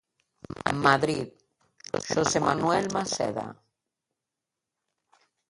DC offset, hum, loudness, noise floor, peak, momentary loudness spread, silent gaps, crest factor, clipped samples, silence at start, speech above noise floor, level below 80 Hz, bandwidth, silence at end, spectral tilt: under 0.1%; none; -26 LUFS; -87 dBFS; -4 dBFS; 18 LU; none; 26 dB; under 0.1%; 0.5 s; 61 dB; -60 dBFS; 11.5 kHz; 1.95 s; -4 dB/octave